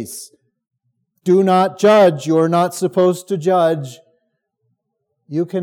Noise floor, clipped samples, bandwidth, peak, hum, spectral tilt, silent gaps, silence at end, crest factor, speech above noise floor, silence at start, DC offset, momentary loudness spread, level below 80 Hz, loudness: -73 dBFS; under 0.1%; 17 kHz; -2 dBFS; none; -6 dB/octave; none; 0 s; 14 dB; 58 dB; 0 s; under 0.1%; 14 LU; -78 dBFS; -15 LUFS